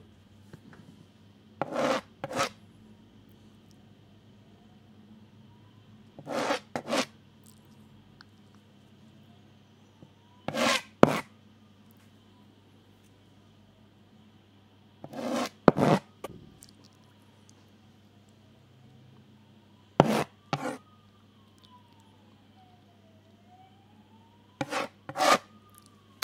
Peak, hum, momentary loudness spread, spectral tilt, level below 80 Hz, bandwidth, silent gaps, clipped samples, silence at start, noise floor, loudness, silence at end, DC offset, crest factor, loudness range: 0 dBFS; none; 29 LU; -4.5 dB/octave; -66 dBFS; 16 kHz; none; under 0.1%; 0.55 s; -59 dBFS; -29 LUFS; 0.85 s; under 0.1%; 34 dB; 12 LU